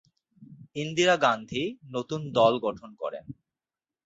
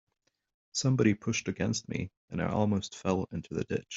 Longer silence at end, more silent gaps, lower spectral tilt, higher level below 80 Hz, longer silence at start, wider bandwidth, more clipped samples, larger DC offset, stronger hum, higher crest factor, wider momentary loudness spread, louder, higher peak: first, 0.75 s vs 0 s; second, none vs 2.17-2.28 s; about the same, -4.5 dB/octave vs -5.5 dB/octave; about the same, -66 dBFS vs -62 dBFS; second, 0.4 s vs 0.75 s; about the same, 8 kHz vs 8 kHz; neither; neither; neither; about the same, 20 dB vs 20 dB; first, 15 LU vs 10 LU; first, -27 LUFS vs -31 LUFS; first, -8 dBFS vs -12 dBFS